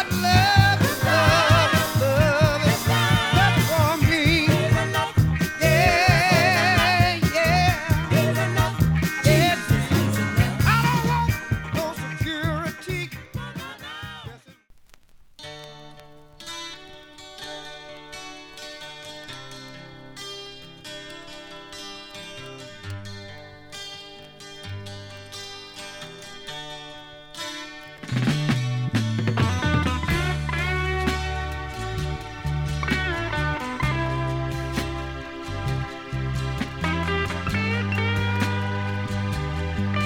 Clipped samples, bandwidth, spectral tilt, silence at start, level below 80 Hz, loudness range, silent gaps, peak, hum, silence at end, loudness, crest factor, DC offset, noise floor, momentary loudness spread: under 0.1%; over 20 kHz; -5 dB/octave; 0 s; -38 dBFS; 19 LU; none; -2 dBFS; none; 0 s; -22 LUFS; 22 dB; under 0.1%; -51 dBFS; 21 LU